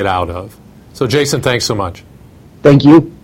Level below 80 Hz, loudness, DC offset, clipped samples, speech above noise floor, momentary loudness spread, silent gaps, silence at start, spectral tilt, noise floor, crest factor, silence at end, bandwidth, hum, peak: -40 dBFS; -12 LUFS; under 0.1%; 0.5%; 28 dB; 15 LU; none; 0 s; -6 dB/octave; -39 dBFS; 12 dB; 0.1 s; 16.5 kHz; none; 0 dBFS